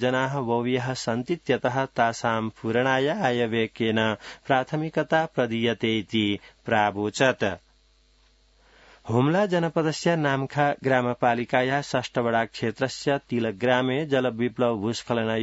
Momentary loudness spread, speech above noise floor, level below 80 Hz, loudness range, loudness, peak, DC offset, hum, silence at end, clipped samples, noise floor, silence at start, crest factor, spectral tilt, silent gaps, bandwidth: 5 LU; 36 dB; -62 dBFS; 2 LU; -25 LUFS; -6 dBFS; under 0.1%; none; 0 s; under 0.1%; -61 dBFS; 0 s; 18 dB; -5.5 dB/octave; none; 8 kHz